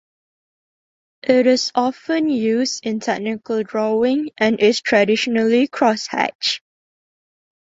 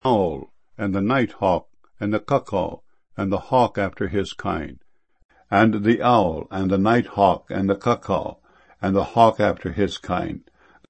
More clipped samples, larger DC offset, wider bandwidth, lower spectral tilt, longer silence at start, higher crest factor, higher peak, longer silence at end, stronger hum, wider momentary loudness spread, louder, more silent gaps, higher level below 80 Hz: neither; second, under 0.1% vs 0.1%; about the same, 8 kHz vs 8.6 kHz; second, -4 dB/octave vs -7.5 dB/octave; first, 1.25 s vs 0.05 s; about the same, 18 dB vs 22 dB; about the same, -2 dBFS vs 0 dBFS; first, 1.15 s vs 0.5 s; neither; second, 7 LU vs 12 LU; first, -18 LUFS vs -22 LUFS; about the same, 6.35-6.39 s vs 5.25-5.29 s; second, -64 dBFS vs -48 dBFS